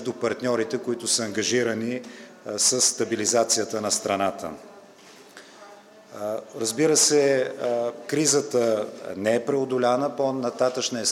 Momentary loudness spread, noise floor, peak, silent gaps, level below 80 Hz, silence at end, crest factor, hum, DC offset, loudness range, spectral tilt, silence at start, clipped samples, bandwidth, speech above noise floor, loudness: 13 LU; -49 dBFS; -4 dBFS; none; -76 dBFS; 0 s; 20 dB; none; under 0.1%; 4 LU; -2.5 dB/octave; 0 s; under 0.1%; 16.5 kHz; 25 dB; -23 LUFS